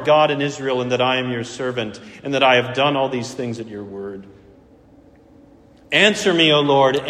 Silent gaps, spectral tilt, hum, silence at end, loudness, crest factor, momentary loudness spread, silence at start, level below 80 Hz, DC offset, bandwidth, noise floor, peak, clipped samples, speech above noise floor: none; -4.5 dB/octave; none; 0 s; -18 LUFS; 18 dB; 17 LU; 0 s; -58 dBFS; under 0.1%; 14 kHz; -49 dBFS; 0 dBFS; under 0.1%; 30 dB